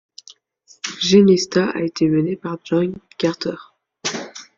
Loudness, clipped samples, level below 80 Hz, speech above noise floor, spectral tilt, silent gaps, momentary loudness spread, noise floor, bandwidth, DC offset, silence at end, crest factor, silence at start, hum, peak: -19 LUFS; under 0.1%; -60 dBFS; 36 dB; -5 dB/octave; none; 16 LU; -54 dBFS; 7.6 kHz; under 0.1%; 0.15 s; 18 dB; 0.85 s; none; -2 dBFS